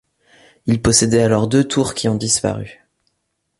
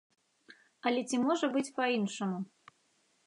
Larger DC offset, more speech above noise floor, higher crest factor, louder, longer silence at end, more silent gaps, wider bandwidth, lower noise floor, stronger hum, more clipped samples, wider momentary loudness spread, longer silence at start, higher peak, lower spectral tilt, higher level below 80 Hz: neither; first, 55 dB vs 41 dB; about the same, 18 dB vs 20 dB; first, -16 LUFS vs -33 LUFS; about the same, 0.85 s vs 0.8 s; neither; about the same, 11.5 kHz vs 11 kHz; about the same, -72 dBFS vs -73 dBFS; neither; neither; first, 13 LU vs 8 LU; first, 0.65 s vs 0.5 s; first, -2 dBFS vs -14 dBFS; about the same, -4.5 dB/octave vs -4.5 dB/octave; first, -40 dBFS vs -86 dBFS